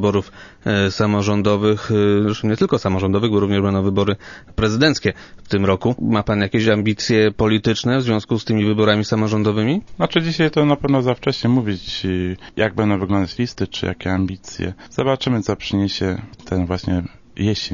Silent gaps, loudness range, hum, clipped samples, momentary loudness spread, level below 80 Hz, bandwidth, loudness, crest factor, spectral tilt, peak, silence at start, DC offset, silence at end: none; 4 LU; none; under 0.1%; 7 LU; -42 dBFS; 7.4 kHz; -19 LUFS; 18 dB; -6.5 dB/octave; 0 dBFS; 0 s; under 0.1%; 0 s